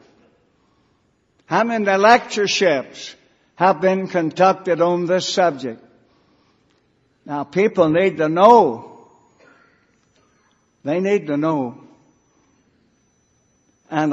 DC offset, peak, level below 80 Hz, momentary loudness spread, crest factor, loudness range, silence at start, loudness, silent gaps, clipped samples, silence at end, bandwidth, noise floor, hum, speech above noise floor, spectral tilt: under 0.1%; 0 dBFS; -66 dBFS; 17 LU; 20 dB; 8 LU; 1.5 s; -17 LUFS; none; under 0.1%; 0 s; 8 kHz; -63 dBFS; none; 46 dB; -5 dB/octave